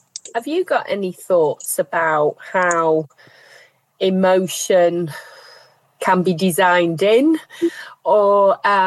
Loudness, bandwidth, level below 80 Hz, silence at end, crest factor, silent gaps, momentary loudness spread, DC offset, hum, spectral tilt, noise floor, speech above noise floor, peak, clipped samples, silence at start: -17 LUFS; 13 kHz; -74 dBFS; 0 s; 14 dB; none; 10 LU; under 0.1%; none; -4.5 dB/octave; -50 dBFS; 33 dB; -4 dBFS; under 0.1%; 0.25 s